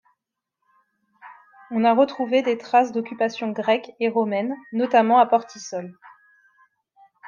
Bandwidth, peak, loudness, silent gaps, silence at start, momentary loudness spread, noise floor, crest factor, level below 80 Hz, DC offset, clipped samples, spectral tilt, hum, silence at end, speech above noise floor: 7.2 kHz; -4 dBFS; -21 LUFS; none; 1.25 s; 14 LU; -81 dBFS; 18 dB; -76 dBFS; under 0.1%; under 0.1%; -5 dB/octave; none; 0 s; 60 dB